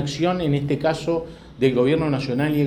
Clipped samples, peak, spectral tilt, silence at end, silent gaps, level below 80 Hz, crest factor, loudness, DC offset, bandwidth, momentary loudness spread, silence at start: under 0.1%; -4 dBFS; -7 dB/octave; 0 s; none; -46 dBFS; 16 dB; -22 LUFS; under 0.1%; 18 kHz; 6 LU; 0 s